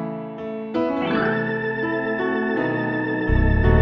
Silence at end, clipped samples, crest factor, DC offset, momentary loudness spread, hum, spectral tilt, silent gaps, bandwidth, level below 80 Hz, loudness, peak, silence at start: 0 s; under 0.1%; 16 dB; under 0.1%; 9 LU; none; -9.5 dB/octave; none; 5.6 kHz; -28 dBFS; -23 LUFS; -6 dBFS; 0 s